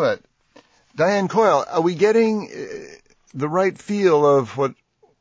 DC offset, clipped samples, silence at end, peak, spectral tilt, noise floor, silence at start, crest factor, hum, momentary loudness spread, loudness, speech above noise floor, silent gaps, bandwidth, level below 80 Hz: under 0.1%; under 0.1%; 0.5 s; -4 dBFS; -6 dB/octave; -54 dBFS; 0 s; 16 dB; none; 17 LU; -19 LUFS; 35 dB; none; 8 kHz; -64 dBFS